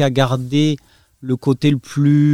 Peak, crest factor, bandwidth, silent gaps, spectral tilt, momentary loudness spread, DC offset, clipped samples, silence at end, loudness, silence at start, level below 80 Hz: 0 dBFS; 16 dB; 12.5 kHz; none; -7 dB/octave; 10 LU; under 0.1%; under 0.1%; 0 s; -17 LUFS; 0 s; -54 dBFS